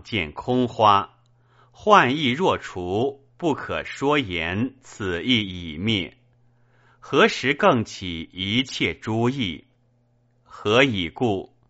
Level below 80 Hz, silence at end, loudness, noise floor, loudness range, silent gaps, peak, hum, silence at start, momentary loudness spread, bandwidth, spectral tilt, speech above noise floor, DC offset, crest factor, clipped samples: -52 dBFS; 0.25 s; -22 LUFS; -63 dBFS; 4 LU; none; 0 dBFS; none; 0.05 s; 12 LU; 8 kHz; -3 dB/octave; 41 dB; under 0.1%; 22 dB; under 0.1%